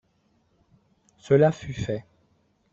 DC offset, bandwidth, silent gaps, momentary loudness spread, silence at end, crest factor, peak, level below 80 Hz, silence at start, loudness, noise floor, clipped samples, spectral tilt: under 0.1%; 7.6 kHz; none; 13 LU; 0.7 s; 20 dB; -8 dBFS; -56 dBFS; 1.25 s; -24 LUFS; -67 dBFS; under 0.1%; -7.5 dB/octave